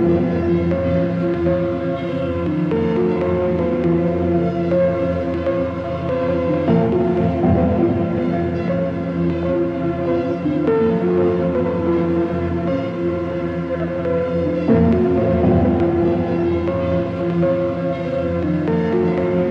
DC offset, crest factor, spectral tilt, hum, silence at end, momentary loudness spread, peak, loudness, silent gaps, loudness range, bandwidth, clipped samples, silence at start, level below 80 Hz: under 0.1%; 14 dB; -10 dB/octave; none; 0 s; 5 LU; -2 dBFS; -19 LUFS; none; 2 LU; 6 kHz; under 0.1%; 0 s; -38 dBFS